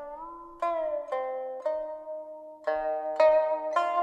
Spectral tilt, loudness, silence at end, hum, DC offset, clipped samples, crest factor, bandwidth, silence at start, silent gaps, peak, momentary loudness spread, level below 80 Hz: -3.5 dB/octave; -29 LUFS; 0 s; none; under 0.1%; under 0.1%; 18 dB; 8.2 kHz; 0 s; none; -12 dBFS; 18 LU; -64 dBFS